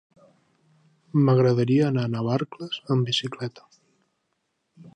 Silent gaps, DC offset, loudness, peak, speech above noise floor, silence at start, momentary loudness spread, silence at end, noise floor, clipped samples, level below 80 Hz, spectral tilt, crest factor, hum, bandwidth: none; under 0.1%; -23 LUFS; -8 dBFS; 53 dB; 1.15 s; 14 LU; 0.05 s; -75 dBFS; under 0.1%; -68 dBFS; -7 dB/octave; 16 dB; none; 9.2 kHz